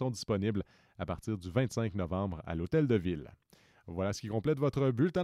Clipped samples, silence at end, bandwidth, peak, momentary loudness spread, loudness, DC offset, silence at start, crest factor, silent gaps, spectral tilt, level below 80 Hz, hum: under 0.1%; 0 s; 13.5 kHz; -16 dBFS; 11 LU; -34 LUFS; under 0.1%; 0 s; 16 dB; none; -7 dB/octave; -56 dBFS; none